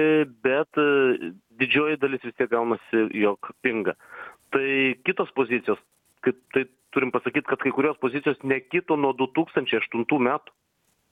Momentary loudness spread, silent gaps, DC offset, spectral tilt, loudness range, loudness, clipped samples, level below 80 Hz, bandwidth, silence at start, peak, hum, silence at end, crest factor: 7 LU; none; under 0.1%; -7 dB/octave; 2 LU; -24 LUFS; under 0.1%; -70 dBFS; 9.6 kHz; 0 s; -6 dBFS; none; 0.75 s; 18 dB